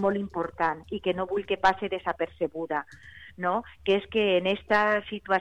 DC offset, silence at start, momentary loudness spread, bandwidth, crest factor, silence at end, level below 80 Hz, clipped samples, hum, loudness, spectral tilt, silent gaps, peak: 0.1%; 0 s; 8 LU; 9 kHz; 16 dB; 0 s; -56 dBFS; under 0.1%; none; -27 LUFS; -6 dB/octave; none; -10 dBFS